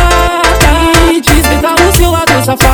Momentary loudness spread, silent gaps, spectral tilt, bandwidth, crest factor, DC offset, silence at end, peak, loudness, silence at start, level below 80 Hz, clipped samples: 2 LU; none; -4 dB/octave; 19.5 kHz; 6 dB; under 0.1%; 0 s; 0 dBFS; -7 LUFS; 0 s; -14 dBFS; 0.7%